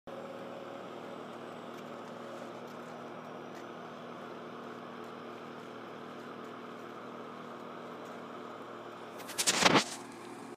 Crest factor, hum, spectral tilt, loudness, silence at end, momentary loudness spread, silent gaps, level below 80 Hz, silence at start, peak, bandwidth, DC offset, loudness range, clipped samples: 30 dB; none; -2.5 dB/octave; -38 LUFS; 0 s; 16 LU; none; -76 dBFS; 0.05 s; -10 dBFS; 15.5 kHz; under 0.1%; 12 LU; under 0.1%